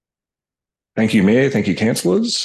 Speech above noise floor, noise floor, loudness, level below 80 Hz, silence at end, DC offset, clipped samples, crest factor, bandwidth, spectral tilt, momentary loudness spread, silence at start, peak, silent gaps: 74 dB; -89 dBFS; -16 LUFS; -50 dBFS; 0 s; under 0.1%; under 0.1%; 14 dB; 12.5 kHz; -5 dB/octave; 6 LU; 0.95 s; -4 dBFS; none